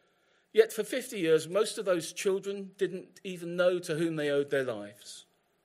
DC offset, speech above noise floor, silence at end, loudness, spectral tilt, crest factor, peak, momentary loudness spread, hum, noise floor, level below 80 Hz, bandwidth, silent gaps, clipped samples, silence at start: under 0.1%; 39 dB; 0.45 s; -30 LUFS; -4.5 dB/octave; 22 dB; -10 dBFS; 15 LU; none; -70 dBFS; -84 dBFS; 16 kHz; none; under 0.1%; 0.55 s